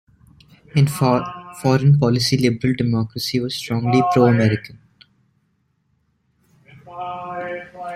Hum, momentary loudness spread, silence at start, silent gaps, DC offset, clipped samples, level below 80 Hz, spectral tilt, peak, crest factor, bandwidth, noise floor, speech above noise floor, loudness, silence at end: none; 15 LU; 0.75 s; none; under 0.1%; under 0.1%; -52 dBFS; -6.5 dB/octave; -2 dBFS; 18 dB; 14.5 kHz; -66 dBFS; 49 dB; -19 LUFS; 0 s